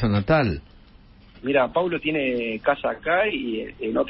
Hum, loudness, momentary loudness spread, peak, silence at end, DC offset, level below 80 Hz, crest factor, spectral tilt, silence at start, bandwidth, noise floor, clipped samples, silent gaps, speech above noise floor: none; -23 LUFS; 8 LU; -6 dBFS; 0 s; under 0.1%; -44 dBFS; 18 dB; -11 dB/octave; 0 s; 5.8 kHz; -50 dBFS; under 0.1%; none; 27 dB